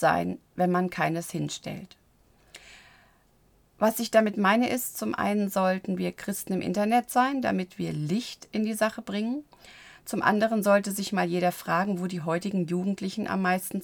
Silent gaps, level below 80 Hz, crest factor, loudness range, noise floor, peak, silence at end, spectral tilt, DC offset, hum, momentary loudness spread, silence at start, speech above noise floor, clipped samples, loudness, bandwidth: none; -64 dBFS; 20 dB; 5 LU; -63 dBFS; -8 dBFS; 0 s; -5.5 dB/octave; under 0.1%; none; 10 LU; 0 s; 36 dB; under 0.1%; -27 LUFS; over 20 kHz